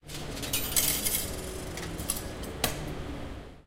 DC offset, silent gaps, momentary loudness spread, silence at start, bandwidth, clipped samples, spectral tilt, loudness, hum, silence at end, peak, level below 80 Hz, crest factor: under 0.1%; none; 14 LU; 0.05 s; 17 kHz; under 0.1%; -2.5 dB/octave; -31 LUFS; none; 0.05 s; -8 dBFS; -44 dBFS; 24 dB